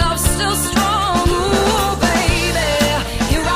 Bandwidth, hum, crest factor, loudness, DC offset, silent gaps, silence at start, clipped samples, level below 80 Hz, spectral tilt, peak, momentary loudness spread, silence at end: 15.5 kHz; none; 12 dB; -16 LUFS; under 0.1%; none; 0 s; under 0.1%; -24 dBFS; -4 dB/octave; -4 dBFS; 2 LU; 0 s